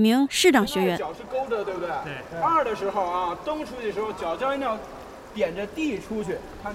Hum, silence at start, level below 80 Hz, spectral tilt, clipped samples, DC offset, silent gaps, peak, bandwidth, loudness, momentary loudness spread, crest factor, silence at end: none; 0 s; -52 dBFS; -4 dB/octave; under 0.1%; under 0.1%; none; -4 dBFS; 16 kHz; -26 LUFS; 13 LU; 22 dB; 0 s